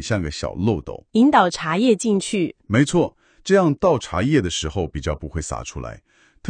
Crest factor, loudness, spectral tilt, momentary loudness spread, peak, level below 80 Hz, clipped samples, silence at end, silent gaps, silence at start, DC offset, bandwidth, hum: 18 dB; -20 LUFS; -5.5 dB/octave; 12 LU; -2 dBFS; -40 dBFS; under 0.1%; 0 s; none; 0 s; under 0.1%; 10 kHz; none